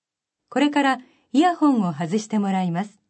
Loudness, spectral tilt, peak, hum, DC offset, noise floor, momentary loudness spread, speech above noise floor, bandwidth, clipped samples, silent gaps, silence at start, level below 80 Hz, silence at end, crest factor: -22 LUFS; -6 dB/octave; -8 dBFS; none; under 0.1%; -81 dBFS; 8 LU; 61 dB; 8.6 kHz; under 0.1%; none; 0.5 s; -80 dBFS; 0.2 s; 14 dB